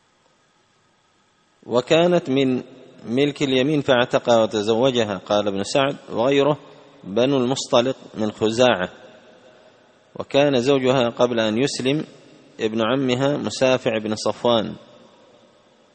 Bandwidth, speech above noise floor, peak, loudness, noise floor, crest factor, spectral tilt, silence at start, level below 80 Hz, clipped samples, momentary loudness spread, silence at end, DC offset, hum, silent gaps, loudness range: 8.8 kHz; 42 dB; -2 dBFS; -20 LUFS; -61 dBFS; 20 dB; -5 dB/octave; 1.65 s; -60 dBFS; under 0.1%; 9 LU; 1.15 s; under 0.1%; none; none; 3 LU